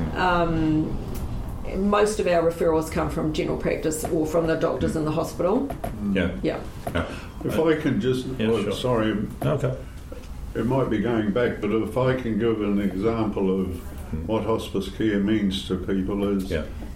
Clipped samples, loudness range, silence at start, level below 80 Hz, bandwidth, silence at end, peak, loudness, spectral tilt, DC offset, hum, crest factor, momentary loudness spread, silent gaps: under 0.1%; 2 LU; 0 s; -38 dBFS; 16.5 kHz; 0 s; -8 dBFS; -25 LUFS; -6.5 dB/octave; under 0.1%; none; 16 dB; 10 LU; none